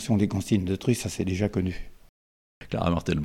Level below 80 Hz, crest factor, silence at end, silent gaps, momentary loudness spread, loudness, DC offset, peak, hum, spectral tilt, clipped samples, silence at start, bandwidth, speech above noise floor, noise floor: -44 dBFS; 18 dB; 0 s; 2.09-2.61 s; 7 LU; -27 LUFS; under 0.1%; -10 dBFS; none; -6.5 dB/octave; under 0.1%; 0 s; 16 kHz; over 64 dB; under -90 dBFS